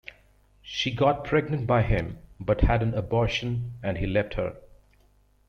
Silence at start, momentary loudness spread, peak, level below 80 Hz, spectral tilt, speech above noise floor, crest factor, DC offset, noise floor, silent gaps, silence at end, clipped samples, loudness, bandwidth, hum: 0.05 s; 10 LU; -6 dBFS; -36 dBFS; -7 dB/octave; 36 dB; 22 dB; under 0.1%; -62 dBFS; none; 0.85 s; under 0.1%; -26 LUFS; 6.8 kHz; 50 Hz at -45 dBFS